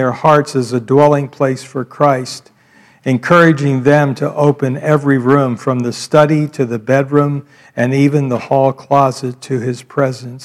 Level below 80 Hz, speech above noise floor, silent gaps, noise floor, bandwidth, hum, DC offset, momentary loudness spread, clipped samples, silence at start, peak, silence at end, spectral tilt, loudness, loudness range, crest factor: -58 dBFS; 35 dB; none; -48 dBFS; 12.5 kHz; none; under 0.1%; 9 LU; 0.3%; 0 s; 0 dBFS; 0 s; -7 dB/octave; -13 LUFS; 2 LU; 14 dB